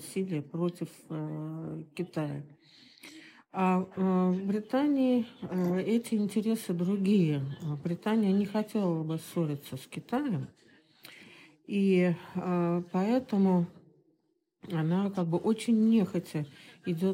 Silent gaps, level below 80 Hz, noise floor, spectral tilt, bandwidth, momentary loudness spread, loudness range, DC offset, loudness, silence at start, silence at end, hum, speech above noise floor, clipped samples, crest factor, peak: none; -78 dBFS; -75 dBFS; -7.5 dB/octave; 16 kHz; 14 LU; 6 LU; under 0.1%; -30 LUFS; 0 s; 0 s; none; 46 dB; under 0.1%; 14 dB; -16 dBFS